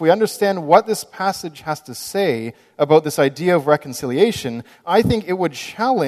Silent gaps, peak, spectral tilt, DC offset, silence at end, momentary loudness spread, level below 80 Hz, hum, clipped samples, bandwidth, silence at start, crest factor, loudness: none; 0 dBFS; -5 dB/octave; under 0.1%; 0 s; 12 LU; -48 dBFS; none; under 0.1%; 14 kHz; 0 s; 18 dB; -19 LUFS